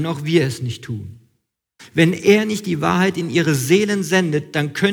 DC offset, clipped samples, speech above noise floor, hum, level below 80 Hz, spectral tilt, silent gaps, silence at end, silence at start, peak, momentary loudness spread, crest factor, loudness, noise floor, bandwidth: under 0.1%; under 0.1%; 52 dB; none; -58 dBFS; -5.5 dB/octave; none; 0 s; 0 s; -2 dBFS; 12 LU; 16 dB; -18 LUFS; -70 dBFS; 19.5 kHz